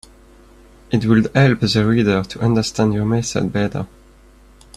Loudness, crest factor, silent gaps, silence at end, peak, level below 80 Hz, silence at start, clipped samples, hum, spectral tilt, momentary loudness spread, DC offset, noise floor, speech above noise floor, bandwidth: -17 LUFS; 18 dB; none; 0.9 s; -2 dBFS; -42 dBFS; 0.9 s; under 0.1%; none; -6 dB/octave; 8 LU; under 0.1%; -47 dBFS; 30 dB; 12 kHz